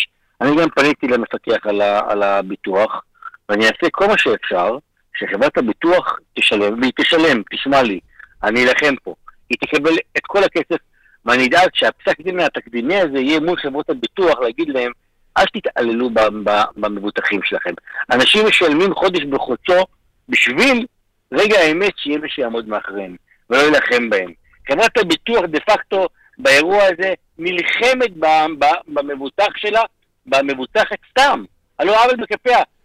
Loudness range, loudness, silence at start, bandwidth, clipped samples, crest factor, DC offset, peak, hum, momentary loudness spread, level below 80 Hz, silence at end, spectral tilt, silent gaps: 3 LU; -16 LUFS; 0 s; 15 kHz; under 0.1%; 14 dB; under 0.1%; -2 dBFS; none; 11 LU; -50 dBFS; 0.2 s; -3.5 dB/octave; none